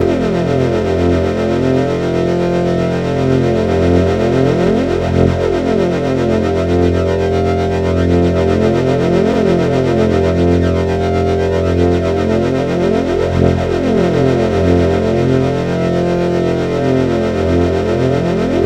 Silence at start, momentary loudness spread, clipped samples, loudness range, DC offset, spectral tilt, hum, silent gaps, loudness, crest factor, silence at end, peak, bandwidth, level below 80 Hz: 0 s; 2 LU; under 0.1%; 1 LU; under 0.1%; -7.5 dB/octave; none; none; -14 LUFS; 12 dB; 0 s; 0 dBFS; 9.6 kHz; -30 dBFS